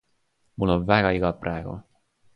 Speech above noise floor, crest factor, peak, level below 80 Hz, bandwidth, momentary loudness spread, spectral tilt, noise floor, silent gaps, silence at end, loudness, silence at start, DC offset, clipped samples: 46 dB; 22 dB; -4 dBFS; -44 dBFS; 5.8 kHz; 19 LU; -8.5 dB/octave; -69 dBFS; none; 0.55 s; -24 LUFS; 0.6 s; under 0.1%; under 0.1%